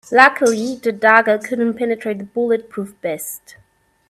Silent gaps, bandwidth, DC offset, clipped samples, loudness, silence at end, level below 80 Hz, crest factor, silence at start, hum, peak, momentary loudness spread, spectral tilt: none; 15.5 kHz; under 0.1%; under 0.1%; -17 LUFS; 0.75 s; -64 dBFS; 18 dB; 0.1 s; none; 0 dBFS; 15 LU; -4 dB/octave